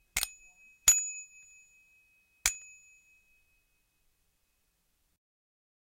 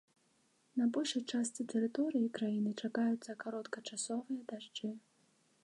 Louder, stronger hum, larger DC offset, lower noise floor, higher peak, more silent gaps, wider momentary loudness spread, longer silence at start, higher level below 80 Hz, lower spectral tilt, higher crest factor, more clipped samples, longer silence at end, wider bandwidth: first, -28 LUFS vs -38 LUFS; neither; neither; about the same, -76 dBFS vs -74 dBFS; first, -8 dBFS vs -24 dBFS; neither; first, 23 LU vs 9 LU; second, 0.15 s vs 0.75 s; first, -60 dBFS vs -88 dBFS; second, 2.5 dB/octave vs -4 dB/octave; first, 30 dB vs 14 dB; neither; first, 3.35 s vs 0.65 s; first, 16 kHz vs 11.5 kHz